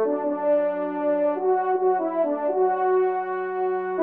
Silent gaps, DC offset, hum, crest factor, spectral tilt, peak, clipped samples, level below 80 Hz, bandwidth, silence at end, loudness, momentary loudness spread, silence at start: none; under 0.1%; none; 10 dB; -5.5 dB/octave; -12 dBFS; under 0.1%; -80 dBFS; 3.5 kHz; 0 s; -23 LUFS; 4 LU; 0 s